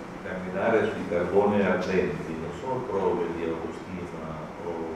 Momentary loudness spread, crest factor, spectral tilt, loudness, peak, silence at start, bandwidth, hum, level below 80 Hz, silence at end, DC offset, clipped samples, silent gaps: 12 LU; 18 dB; -7 dB/octave; -28 LUFS; -10 dBFS; 0 s; 12 kHz; none; -54 dBFS; 0 s; under 0.1%; under 0.1%; none